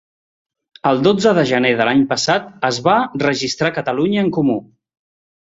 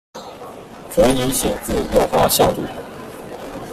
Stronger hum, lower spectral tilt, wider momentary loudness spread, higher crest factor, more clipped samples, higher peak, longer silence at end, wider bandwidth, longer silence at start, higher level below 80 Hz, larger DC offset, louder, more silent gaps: neither; about the same, -5 dB/octave vs -4 dB/octave; second, 5 LU vs 20 LU; about the same, 16 dB vs 18 dB; neither; about the same, 0 dBFS vs -2 dBFS; first, 0.95 s vs 0 s; second, 8 kHz vs 16 kHz; first, 0.85 s vs 0.15 s; second, -56 dBFS vs -36 dBFS; neither; about the same, -16 LUFS vs -17 LUFS; neither